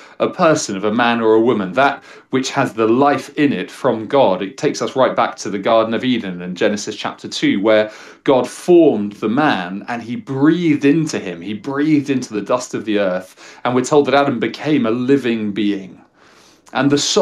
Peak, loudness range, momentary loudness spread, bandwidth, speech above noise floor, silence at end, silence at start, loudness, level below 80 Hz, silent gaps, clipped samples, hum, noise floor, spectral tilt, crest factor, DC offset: -2 dBFS; 2 LU; 11 LU; 12.5 kHz; 32 dB; 0 s; 0 s; -17 LUFS; -64 dBFS; none; under 0.1%; none; -48 dBFS; -5 dB/octave; 16 dB; under 0.1%